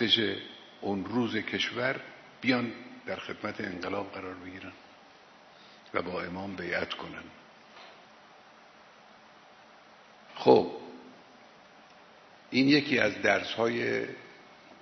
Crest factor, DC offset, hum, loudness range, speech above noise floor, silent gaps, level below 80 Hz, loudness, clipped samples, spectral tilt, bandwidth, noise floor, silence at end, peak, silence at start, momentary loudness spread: 26 dB; under 0.1%; none; 11 LU; 26 dB; none; -72 dBFS; -30 LUFS; under 0.1%; -5 dB/octave; 6.4 kHz; -55 dBFS; 0.05 s; -6 dBFS; 0 s; 23 LU